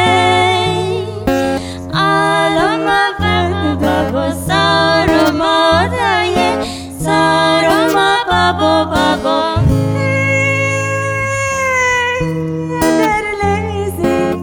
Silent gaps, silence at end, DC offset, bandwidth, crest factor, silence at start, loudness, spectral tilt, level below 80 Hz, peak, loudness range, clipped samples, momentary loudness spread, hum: none; 0 s; under 0.1%; over 20 kHz; 14 dB; 0 s; -13 LUFS; -5 dB/octave; -34 dBFS; 0 dBFS; 2 LU; under 0.1%; 6 LU; none